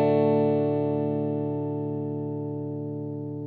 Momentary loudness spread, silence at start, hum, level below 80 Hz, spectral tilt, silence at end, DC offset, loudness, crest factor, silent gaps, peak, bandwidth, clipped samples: 11 LU; 0 s; none; -66 dBFS; -12 dB/octave; 0 s; under 0.1%; -27 LUFS; 16 dB; none; -10 dBFS; 4.7 kHz; under 0.1%